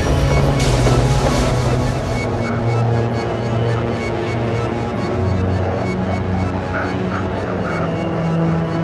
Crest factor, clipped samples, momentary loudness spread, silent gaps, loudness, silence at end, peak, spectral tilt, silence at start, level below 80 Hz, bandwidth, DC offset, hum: 16 dB; under 0.1%; 5 LU; none; -18 LUFS; 0 s; -2 dBFS; -6.5 dB/octave; 0 s; -28 dBFS; 12.5 kHz; under 0.1%; none